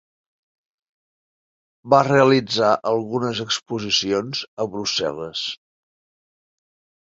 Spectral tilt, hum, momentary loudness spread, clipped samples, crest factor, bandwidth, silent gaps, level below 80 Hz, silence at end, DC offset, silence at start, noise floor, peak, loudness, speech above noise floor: -4 dB/octave; none; 12 LU; under 0.1%; 22 dB; 7.8 kHz; 4.48-4.57 s; -62 dBFS; 1.55 s; under 0.1%; 1.85 s; under -90 dBFS; -2 dBFS; -20 LUFS; over 70 dB